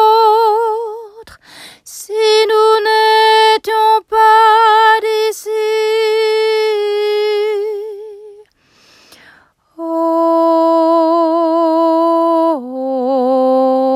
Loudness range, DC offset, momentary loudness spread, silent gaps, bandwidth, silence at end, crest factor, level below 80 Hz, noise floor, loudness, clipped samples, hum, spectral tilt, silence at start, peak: 8 LU; under 0.1%; 13 LU; none; 16 kHz; 0 s; 12 dB; -64 dBFS; -51 dBFS; -12 LUFS; under 0.1%; none; -1.5 dB/octave; 0 s; 0 dBFS